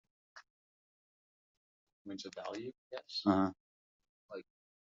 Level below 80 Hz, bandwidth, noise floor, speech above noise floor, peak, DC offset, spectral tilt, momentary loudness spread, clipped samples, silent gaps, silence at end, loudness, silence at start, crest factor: -82 dBFS; 7.6 kHz; under -90 dBFS; over 53 dB; -16 dBFS; under 0.1%; -4.5 dB/octave; 27 LU; under 0.1%; 0.50-1.87 s, 1.93-2.05 s, 2.78-2.91 s, 3.60-4.00 s, 4.09-4.29 s; 0.5 s; -38 LUFS; 0.35 s; 26 dB